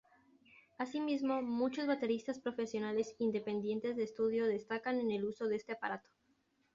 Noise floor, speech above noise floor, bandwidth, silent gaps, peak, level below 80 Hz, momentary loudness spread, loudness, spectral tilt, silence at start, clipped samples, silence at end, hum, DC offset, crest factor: -77 dBFS; 40 dB; 7.6 kHz; none; -22 dBFS; -78 dBFS; 6 LU; -38 LUFS; -4.5 dB/octave; 0.8 s; under 0.1%; 0.75 s; none; under 0.1%; 14 dB